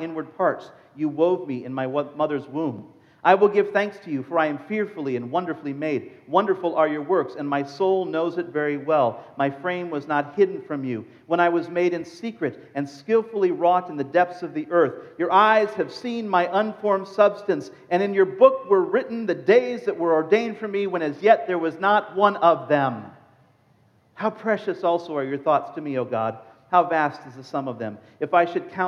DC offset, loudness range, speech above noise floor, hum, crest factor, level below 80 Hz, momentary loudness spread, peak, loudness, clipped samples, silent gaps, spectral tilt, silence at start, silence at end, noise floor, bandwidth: under 0.1%; 4 LU; 37 dB; none; 20 dB; -80 dBFS; 11 LU; -2 dBFS; -23 LUFS; under 0.1%; none; -7 dB/octave; 0 s; 0 s; -60 dBFS; 7 kHz